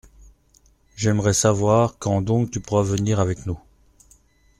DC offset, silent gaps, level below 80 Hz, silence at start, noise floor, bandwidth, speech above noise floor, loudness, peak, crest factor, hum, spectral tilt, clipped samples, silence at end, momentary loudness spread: under 0.1%; none; -48 dBFS; 0.95 s; -58 dBFS; 13.5 kHz; 38 dB; -21 LUFS; -4 dBFS; 18 dB; none; -5.5 dB/octave; under 0.1%; 1 s; 8 LU